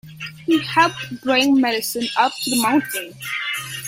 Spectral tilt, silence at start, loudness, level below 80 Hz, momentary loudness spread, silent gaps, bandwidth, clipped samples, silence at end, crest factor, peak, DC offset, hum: -3 dB/octave; 0.05 s; -19 LUFS; -62 dBFS; 11 LU; none; 16.5 kHz; under 0.1%; 0 s; 18 dB; -2 dBFS; under 0.1%; none